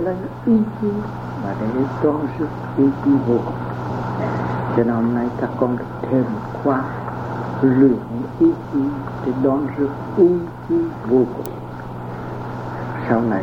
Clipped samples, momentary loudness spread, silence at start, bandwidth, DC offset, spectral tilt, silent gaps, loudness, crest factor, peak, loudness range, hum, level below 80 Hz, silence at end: under 0.1%; 12 LU; 0 s; 16 kHz; under 0.1%; -9.5 dB/octave; none; -20 LUFS; 18 dB; -2 dBFS; 2 LU; none; -46 dBFS; 0 s